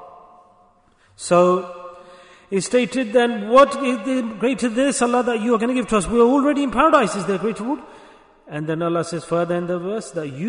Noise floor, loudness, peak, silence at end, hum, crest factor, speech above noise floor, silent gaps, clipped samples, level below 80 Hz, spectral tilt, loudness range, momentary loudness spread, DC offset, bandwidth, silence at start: -56 dBFS; -19 LUFS; -2 dBFS; 0 s; none; 18 dB; 37 dB; none; under 0.1%; -48 dBFS; -5 dB/octave; 4 LU; 12 LU; under 0.1%; 11 kHz; 0 s